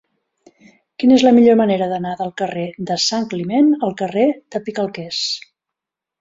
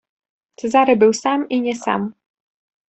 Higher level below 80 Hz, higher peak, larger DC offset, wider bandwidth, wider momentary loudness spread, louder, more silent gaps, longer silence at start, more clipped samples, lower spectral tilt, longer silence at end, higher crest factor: about the same, -60 dBFS vs -64 dBFS; about the same, -2 dBFS vs -2 dBFS; neither; about the same, 7.8 kHz vs 8.4 kHz; about the same, 13 LU vs 11 LU; about the same, -17 LUFS vs -17 LUFS; neither; first, 1 s vs 0.65 s; neither; about the same, -5 dB/octave vs -4.5 dB/octave; about the same, 0.8 s vs 0.8 s; about the same, 16 dB vs 16 dB